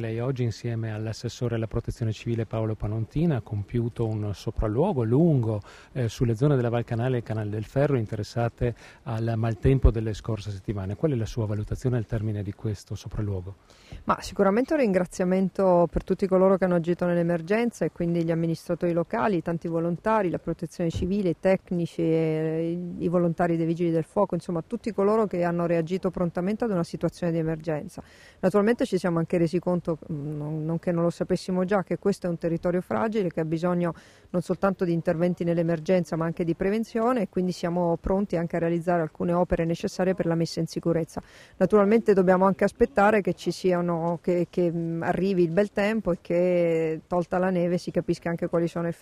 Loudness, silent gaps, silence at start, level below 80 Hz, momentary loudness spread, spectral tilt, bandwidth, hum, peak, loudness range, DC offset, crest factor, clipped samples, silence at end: -26 LUFS; none; 0 s; -42 dBFS; 9 LU; -8 dB/octave; 12.5 kHz; none; -6 dBFS; 4 LU; under 0.1%; 18 dB; under 0.1%; 0.1 s